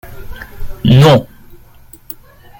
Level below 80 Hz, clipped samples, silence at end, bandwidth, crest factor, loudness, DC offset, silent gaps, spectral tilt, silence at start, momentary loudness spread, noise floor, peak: -32 dBFS; under 0.1%; 1.35 s; 17 kHz; 14 dB; -9 LUFS; under 0.1%; none; -7 dB/octave; 0.05 s; 25 LU; -40 dBFS; 0 dBFS